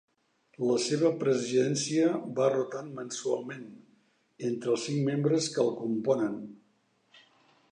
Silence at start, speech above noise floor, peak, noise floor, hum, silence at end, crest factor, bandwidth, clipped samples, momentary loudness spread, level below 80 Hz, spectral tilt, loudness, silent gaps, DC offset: 0.6 s; 41 dB; -12 dBFS; -70 dBFS; none; 1.2 s; 18 dB; 10.5 kHz; under 0.1%; 11 LU; -80 dBFS; -5 dB/octave; -29 LUFS; none; under 0.1%